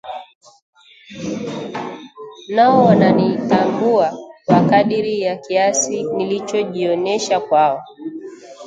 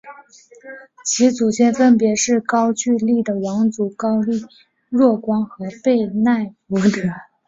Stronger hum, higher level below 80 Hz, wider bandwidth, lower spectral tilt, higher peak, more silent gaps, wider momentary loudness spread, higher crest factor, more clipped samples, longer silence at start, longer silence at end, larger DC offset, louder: neither; about the same, -58 dBFS vs -60 dBFS; first, 9.4 kHz vs 7.8 kHz; about the same, -5 dB/octave vs -5 dB/octave; about the same, 0 dBFS vs -2 dBFS; first, 0.35-0.41 s, 0.62-0.73 s vs none; first, 19 LU vs 10 LU; about the same, 16 dB vs 16 dB; neither; about the same, 0.05 s vs 0.05 s; second, 0 s vs 0.25 s; neither; about the same, -16 LUFS vs -18 LUFS